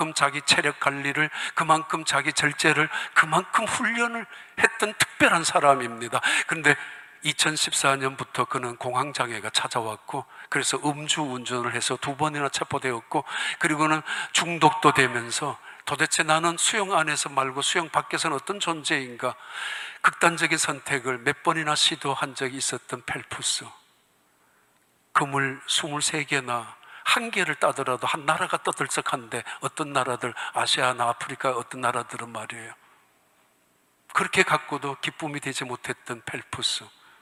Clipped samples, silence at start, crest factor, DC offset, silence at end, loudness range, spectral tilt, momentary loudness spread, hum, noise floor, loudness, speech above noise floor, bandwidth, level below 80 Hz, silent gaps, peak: under 0.1%; 0 s; 26 dB; under 0.1%; 0.35 s; 6 LU; -2.5 dB/octave; 11 LU; none; -65 dBFS; -24 LUFS; 39 dB; 16 kHz; -70 dBFS; none; 0 dBFS